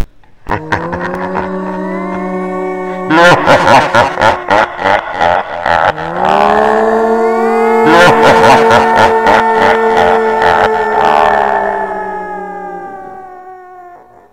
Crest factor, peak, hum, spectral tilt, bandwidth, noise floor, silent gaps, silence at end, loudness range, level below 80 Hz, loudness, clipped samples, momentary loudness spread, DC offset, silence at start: 10 dB; 0 dBFS; none; -5 dB/octave; 16.5 kHz; -36 dBFS; none; 0.35 s; 6 LU; -38 dBFS; -10 LUFS; 1%; 14 LU; 1%; 0 s